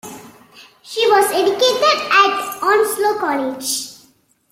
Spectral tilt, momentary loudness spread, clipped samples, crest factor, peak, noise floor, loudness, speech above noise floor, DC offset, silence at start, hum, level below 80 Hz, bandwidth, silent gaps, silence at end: -1 dB/octave; 10 LU; under 0.1%; 16 dB; 0 dBFS; -55 dBFS; -16 LUFS; 39 dB; under 0.1%; 0.05 s; none; -64 dBFS; 16.5 kHz; none; 0.55 s